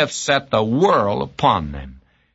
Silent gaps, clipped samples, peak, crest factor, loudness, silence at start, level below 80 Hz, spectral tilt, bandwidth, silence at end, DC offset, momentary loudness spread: none; under 0.1%; -2 dBFS; 18 dB; -18 LUFS; 0 s; -42 dBFS; -4.5 dB/octave; 8 kHz; 0.4 s; under 0.1%; 9 LU